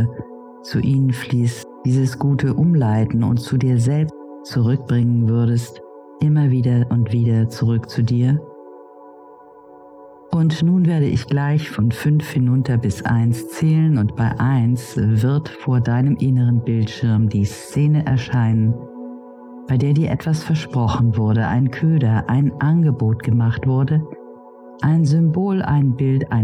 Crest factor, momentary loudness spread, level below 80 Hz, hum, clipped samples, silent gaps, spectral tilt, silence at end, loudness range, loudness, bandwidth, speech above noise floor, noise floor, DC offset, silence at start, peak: 12 dB; 7 LU; -46 dBFS; none; under 0.1%; none; -8 dB/octave; 0 s; 2 LU; -18 LUFS; 12.5 kHz; 26 dB; -43 dBFS; under 0.1%; 0 s; -6 dBFS